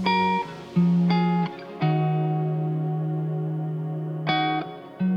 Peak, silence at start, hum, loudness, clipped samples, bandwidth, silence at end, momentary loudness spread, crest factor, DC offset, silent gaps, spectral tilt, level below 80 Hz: -10 dBFS; 0 s; none; -25 LUFS; under 0.1%; 6.2 kHz; 0 s; 8 LU; 14 dB; under 0.1%; none; -8.5 dB/octave; -66 dBFS